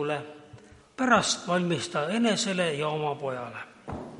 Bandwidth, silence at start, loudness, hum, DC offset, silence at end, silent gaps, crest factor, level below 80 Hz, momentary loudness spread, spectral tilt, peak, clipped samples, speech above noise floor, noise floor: 11.5 kHz; 0 s; -27 LUFS; none; under 0.1%; 0 s; none; 22 dB; -60 dBFS; 17 LU; -4 dB/octave; -6 dBFS; under 0.1%; 24 dB; -51 dBFS